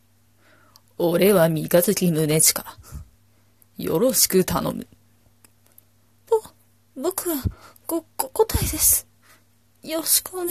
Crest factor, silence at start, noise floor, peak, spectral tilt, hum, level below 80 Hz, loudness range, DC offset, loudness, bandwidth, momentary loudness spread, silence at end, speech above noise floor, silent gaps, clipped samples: 20 dB; 1 s; -60 dBFS; -2 dBFS; -4 dB/octave; none; -42 dBFS; 8 LU; under 0.1%; -20 LUFS; 15 kHz; 15 LU; 0 s; 39 dB; none; under 0.1%